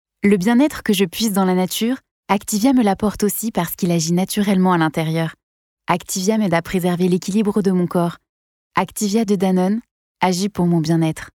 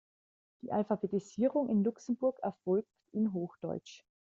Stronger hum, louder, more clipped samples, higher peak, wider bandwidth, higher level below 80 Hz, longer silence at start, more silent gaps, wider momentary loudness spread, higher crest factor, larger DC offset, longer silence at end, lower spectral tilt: neither; first, -18 LUFS vs -34 LUFS; neither; first, -4 dBFS vs -18 dBFS; first, 18.5 kHz vs 7.6 kHz; first, -50 dBFS vs -76 dBFS; second, 0.25 s vs 0.65 s; first, 2.11-2.23 s, 5.43-5.77 s, 8.29-8.70 s, 9.91-10.15 s vs none; second, 6 LU vs 10 LU; about the same, 14 dB vs 16 dB; neither; second, 0.05 s vs 0.25 s; second, -5.5 dB/octave vs -8.5 dB/octave